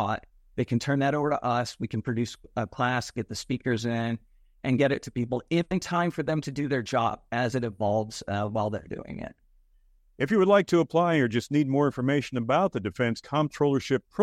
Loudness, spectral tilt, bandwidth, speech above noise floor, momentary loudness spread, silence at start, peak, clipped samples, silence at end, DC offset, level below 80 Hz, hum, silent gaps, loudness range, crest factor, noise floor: -27 LUFS; -6.5 dB/octave; 14.5 kHz; 35 dB; 10 LU; 0 s; -8 dBFS; under 0.1%; 0 s; under 0.1%; -58 dBFS; none; none; 5 LU; 18 dB; -61 dBFS